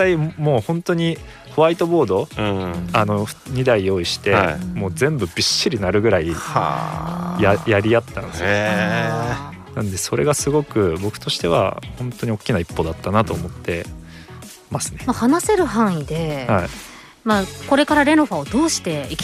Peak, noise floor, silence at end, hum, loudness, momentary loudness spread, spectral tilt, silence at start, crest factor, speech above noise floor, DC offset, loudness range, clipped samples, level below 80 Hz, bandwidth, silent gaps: -4 dBFS; -39 dBFS; 0 s; none; -19 LUFS; 10 LU; -5 dB/octave; 0 s; 16 dB; 20 dB; under 0.1%; 3 LU; under 0.1%; -42 dBFS; 15.5 kHz; none